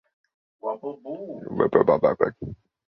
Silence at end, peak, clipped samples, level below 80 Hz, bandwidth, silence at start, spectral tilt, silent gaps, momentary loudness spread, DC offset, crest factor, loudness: 0.35 s; -2 dBFS; under 0.1%; -56 dBFS; 5.6 kHz; 0.65 s; -10.5 dB/octave; none; 17 LU; under 0.1%; 22 dB; -23 LUFS